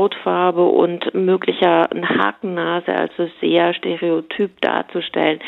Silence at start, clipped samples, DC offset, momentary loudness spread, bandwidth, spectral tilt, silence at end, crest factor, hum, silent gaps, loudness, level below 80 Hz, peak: 0 s; under 0.1%; under 0.1%; 7 LU; 4.2 kHz; -8 dB/octave; 0 s; 16 dB; none; none; -18 LUFS; -70 dBFS; -2 dBFS